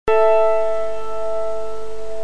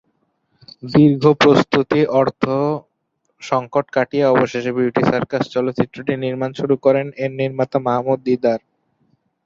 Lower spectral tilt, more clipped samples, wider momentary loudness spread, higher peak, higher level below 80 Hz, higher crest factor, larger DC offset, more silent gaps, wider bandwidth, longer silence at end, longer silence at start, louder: second, -5 dB/octave vs -7 dB/octave; neither; first, 16 LU vs 9 LU; second, -4 dBFS vs 0 dBFS; first, -42 dBFS vs -56 dBFS; about the same, 14 dB vs 18 dB; first, 10% vs under 0.1%; neither; first, 10.5 kHz vs 7.6 kHz; second, 0 s vs 0.85 s; second, 0.05 s vs 0.85 s; about the same, -20 LUFS vs -18 LUFS